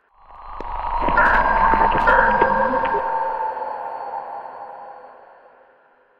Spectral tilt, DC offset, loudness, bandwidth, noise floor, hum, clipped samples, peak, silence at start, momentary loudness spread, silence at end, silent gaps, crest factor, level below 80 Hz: -6.5 dB/octave; under 0.1%; -19 LUFS; 6 kHz; -55 dBFS; none; under 0.1%; -2 dBFS; 0.3 s; 20 LU; 0.85 s; none; 20 dB; -34 dBFS